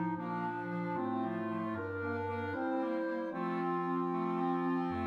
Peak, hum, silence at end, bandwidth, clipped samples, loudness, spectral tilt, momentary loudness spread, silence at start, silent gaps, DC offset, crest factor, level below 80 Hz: -24 dBFS; none; 0 s; 6.4 kHz; under 0.1%; -36 LUFS; -9 dB/octave; 4 LU; 0 s; none; under 0.1%; 12 dB; -70 dBFS